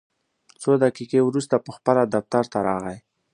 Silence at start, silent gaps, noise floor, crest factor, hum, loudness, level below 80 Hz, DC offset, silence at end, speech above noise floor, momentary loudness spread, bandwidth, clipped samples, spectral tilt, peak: 0.6 s; none; -60 dBFS; 20 dB; none; -22 LUFS; -62 dBFS; under 0.1%; 0.35 s; 38 dB; 9 LU; 11 kHz; under 0.1%; -6.5 dB/octave; -2 dBFS